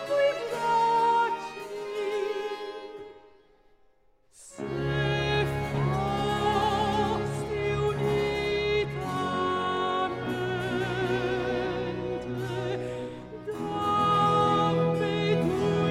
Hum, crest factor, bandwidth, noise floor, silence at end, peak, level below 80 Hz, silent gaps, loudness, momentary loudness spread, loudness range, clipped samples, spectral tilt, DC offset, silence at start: none; 16 dB; 15.5 kHz; -65 dBFS; 0 s; -12 dBFS; -48 dBFS; none; -28 LUFS; 12 LU; 6 LU; under 0.1%; -6 dB/octave; under 0.1%; 0 s